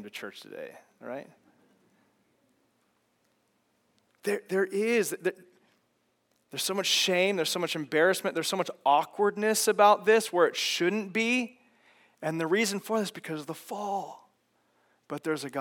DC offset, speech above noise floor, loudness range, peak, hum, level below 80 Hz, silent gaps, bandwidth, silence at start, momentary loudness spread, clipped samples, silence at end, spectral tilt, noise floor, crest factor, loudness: under 0.1%; 45 dB; 11 LU; -8 dBFS; none; under -90 dBFS; none; 18 kHz; 0 s; 18 LU; under 0.1%; 0 s; -3 dB/octave; -73 dBFS; 22 dB; -27 LUFS